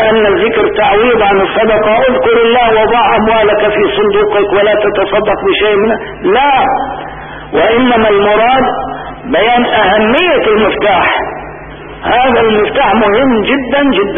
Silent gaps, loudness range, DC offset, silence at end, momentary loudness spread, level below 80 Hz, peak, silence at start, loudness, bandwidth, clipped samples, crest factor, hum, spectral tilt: none; 2 LU; 0.5%; 0 s; 8 LU; -34 dBFS; 0 dBFS; 0 s; -9 LUFS; 3.7 kHz; under 0.1%; 10 dB; none; -8.5 dB/octave